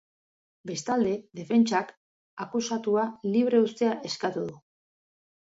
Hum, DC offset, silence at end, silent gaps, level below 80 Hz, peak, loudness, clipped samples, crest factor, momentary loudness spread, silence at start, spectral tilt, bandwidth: none; under 0.1%; 0.85 s; 1.97-2.37 s; -72 dBFS; -10 dBFS; -27 LUFS; under 0.1%; 18 dB; 14 LU; 0.65 s; -5 dB/octave; 7.8 kHz